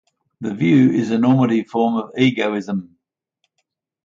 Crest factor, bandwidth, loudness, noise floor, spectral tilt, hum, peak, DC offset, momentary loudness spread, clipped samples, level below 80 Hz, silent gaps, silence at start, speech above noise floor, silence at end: 16 dB; 7.4 kHz; -18 LUFS; -74 dBFS; -7.5 dB/octave; none; -4 dBFS; under 0.1%; 13 LU; under 0.1%; -62 dBFS; none; 0.4 s; 57 dB; 1.2 s